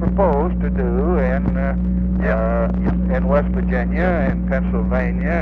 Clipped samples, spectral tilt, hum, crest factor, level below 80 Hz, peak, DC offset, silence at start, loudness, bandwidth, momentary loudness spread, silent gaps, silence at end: under 0.1%; -11 dB/octave; 60 Hz at -20 dBFS; 14 dB; -22 dBFS; -4 dBFS; under 0.1%; 0 s; -19 LUFS; 4.2 kHz; 3 LU; none; 0 s